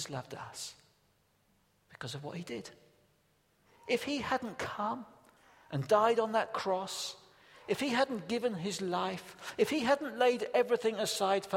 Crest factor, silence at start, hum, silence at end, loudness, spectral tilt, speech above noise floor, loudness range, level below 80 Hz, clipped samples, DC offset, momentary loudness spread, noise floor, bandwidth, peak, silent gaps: 20 dB; 0 s; none; 0 s; -33 LUFS; -4 dB/octave; 39 dB; 13 LU; -74 dBFS; under 0.1%; under 0.1%; 15 LU; -72 dBFS; 16.5 kHz; -14 dBFS; none